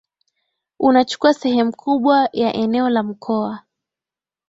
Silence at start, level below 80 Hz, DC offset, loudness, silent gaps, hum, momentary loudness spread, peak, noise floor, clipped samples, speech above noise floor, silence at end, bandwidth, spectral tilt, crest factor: 0.8 s; -60 dBFS; under 0.1%; -18 LUFS; none; none; 7 LU; -2 dBFS; -90 dBFS; under 0.1%; 73 dB; 0.9 s; 8 kHz; -5.5 dB/octave; 18 dB